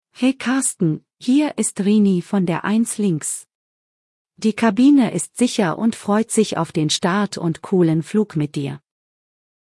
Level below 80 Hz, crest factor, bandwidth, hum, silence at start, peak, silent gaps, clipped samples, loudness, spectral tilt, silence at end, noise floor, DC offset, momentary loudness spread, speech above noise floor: -64 dBFS; 16 dB; 12 kHz; none; 0.2 s; -4 dBFS; 3.55-4.25 s; under 0.1%; -19 LUFS; -5 dB/octave; 0.85 s; under -90 dBFS; under 0.1%; 8 LU; over 72 dB